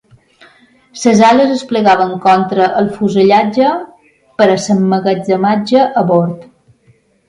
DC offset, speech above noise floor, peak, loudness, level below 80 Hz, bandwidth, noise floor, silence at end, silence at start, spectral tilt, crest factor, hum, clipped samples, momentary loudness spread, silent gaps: under 0.1%; 41 dB; 0 dBFS; -11 LUFS; -54 dBFS; 11 kHz; -51 dBFS; 0.85 s; 0.95 s; -6 dB/octave; 12 dB; none; under 0.1%; 6 LU; none